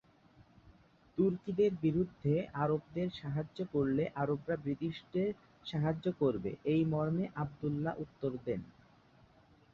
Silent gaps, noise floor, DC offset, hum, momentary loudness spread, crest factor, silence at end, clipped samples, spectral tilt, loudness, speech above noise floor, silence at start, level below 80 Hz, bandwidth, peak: none; -64 dBFS; under 0.1%; none; 7 LU; 16 dB; 1.1 s; under 0.1%; -9.5 dB/octave; -35 LUFS; 30 dB; 1.15 s; -64 dBFS; 6.8 kHz; -18 dBFS